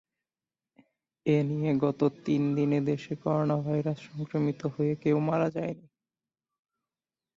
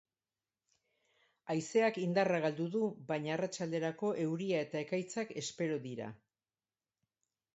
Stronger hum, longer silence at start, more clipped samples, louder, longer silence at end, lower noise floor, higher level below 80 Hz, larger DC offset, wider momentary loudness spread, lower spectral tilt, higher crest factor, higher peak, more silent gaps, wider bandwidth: neither; second, 1.25 s vs 1.45 s; neither; first, -29 LUFS vs -36 LUFS; first, 1.55 s vs 1.4 s; about the same, under -90 dBFS vs under -90 dBFS; first, -68 dBFS vs -82 dBFS; neither; about the same, 8 LU vs 9 LU; first, -9 dB/octave vs -5 dB/octave; about the same, 16 dB vs 18 dB; first, -12 dBFS vs -18 dBFS; neither; about the same, 7.4 kHz vs 8 kHz